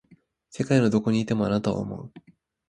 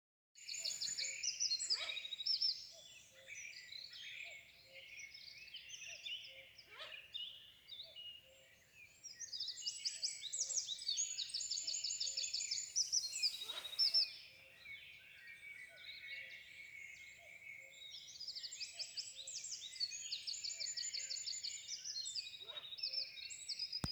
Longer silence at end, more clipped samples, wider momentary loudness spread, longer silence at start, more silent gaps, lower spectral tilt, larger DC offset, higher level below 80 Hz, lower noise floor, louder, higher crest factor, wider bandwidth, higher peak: first, 0.5 s vs 0 s; neither; about the same, 19 LU vs 18 LU; first, 0.55 s vs 0.35 s; neither; first, -7 dB/octave vs 1.5 dB/octave; neither; first, -56 dBFS vs -76 dBFS; second, -59 dBFS vs -66 dBFS; first, -25 LUFS vs -41 LUFS; about the same, 20 dB vs 20 dB; second, 11 kHz vs over 20 kHz; first, -6 dBFS vs -24 dBFS